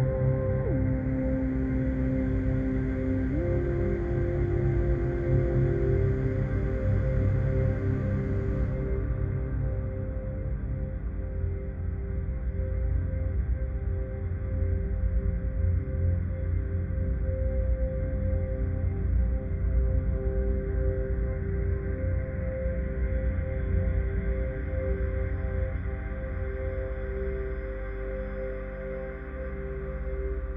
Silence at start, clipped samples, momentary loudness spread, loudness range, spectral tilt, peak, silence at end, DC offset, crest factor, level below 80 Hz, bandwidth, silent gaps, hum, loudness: 0 s; under 0.1%; 8 LU; 6 LU; -11.5 dB/octave; -14 dBFS; 0 s; under 0.1%; 14 dB; -32 dBFS; 3.6 kHz; none; none; -30 LUFS